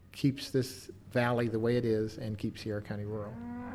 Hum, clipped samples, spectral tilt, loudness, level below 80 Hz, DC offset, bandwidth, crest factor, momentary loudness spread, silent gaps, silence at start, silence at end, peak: none; under 0.1%; -6.5 dB/octave; -34 LUFS; -60 dBFS; under 0.1%; 15.5 kHz; 16 dB; 10 LU; none; 0 s; 0 s; -16 dBFS